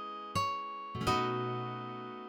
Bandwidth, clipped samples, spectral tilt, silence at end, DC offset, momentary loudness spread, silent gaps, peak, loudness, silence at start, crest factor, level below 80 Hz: 17 kHz; under 0.1%; -5 dB/octave; 0 s; under 0.1%; 9 LU; none; -18 dBFS; -35 LUFS; 0 s; 18 dB; -60 dBFS